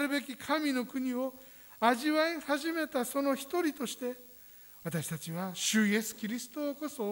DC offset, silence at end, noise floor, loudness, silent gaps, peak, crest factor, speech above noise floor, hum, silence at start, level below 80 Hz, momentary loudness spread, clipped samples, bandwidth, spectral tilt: under 0.1%; 0 s; -54 dBFS; -33 LUFS; none; -14 dBFS; 20 dB; 21 dB; none; 0 s; -74 dBFS; 13 LU; under 0.1%; over 20 kHz; -4 dB/octave